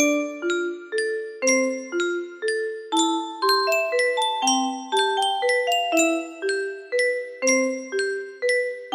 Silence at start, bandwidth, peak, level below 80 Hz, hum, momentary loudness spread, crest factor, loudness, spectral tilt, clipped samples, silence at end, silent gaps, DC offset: 0 s; 15.5 kHz; -8 dBFS; -74 dBFS; none; 6 LU; 16 dB; -23 LUFS; 0 dB/octave; under 0.1%; 0 s; none; under 0.1%